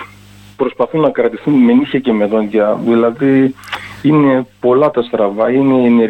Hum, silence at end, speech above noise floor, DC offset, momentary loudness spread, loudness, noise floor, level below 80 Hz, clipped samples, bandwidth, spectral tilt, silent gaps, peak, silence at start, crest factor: none; 0 s; 28 dB; under 0.1%; 6 LU; -13 LUFS; -39 dBFS; -52 dBFS; under 0.1%; 8.4 kHz; -8.5 dB/octave; none; -2 dBFS; 0 s; 12 dB